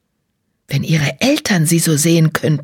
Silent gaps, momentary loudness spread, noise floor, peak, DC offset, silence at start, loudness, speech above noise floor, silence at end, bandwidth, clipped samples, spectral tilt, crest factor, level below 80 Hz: none; 5 LU; -68 dBFS; 0 dBFS; under 0.1%; 0.7 s; -14 LUFS; 54 dB; 0 s; 17.5 kHz; under 0.1%; -4.5 dB/octave; 14 dB; -52 dBFS